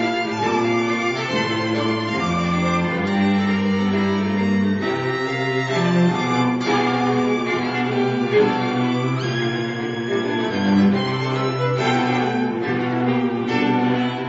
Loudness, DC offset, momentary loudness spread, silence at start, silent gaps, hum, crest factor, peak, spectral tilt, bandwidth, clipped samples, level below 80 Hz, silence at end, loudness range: -20 LUFS; under 0.1%; 4 LU; 0 s; none; none; 14 dB; -6 dBFS; -6.5 dB/octave; 7.8 kHz; under 0.1%; -54 dBFS; 0 s; 1 LU